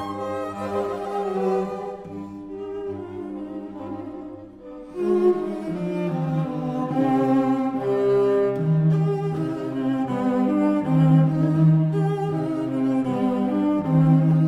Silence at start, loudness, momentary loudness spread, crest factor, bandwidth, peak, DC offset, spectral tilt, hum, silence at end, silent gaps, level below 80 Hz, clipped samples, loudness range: 0 s; -22 LUFS; 16 LU; 14 dB; 7.6 kHz; -8 dBFS; under 0.1%; -9.5 dB/octave; none; 0 s; none; -58 dBFS; under 0.1%; 9 LU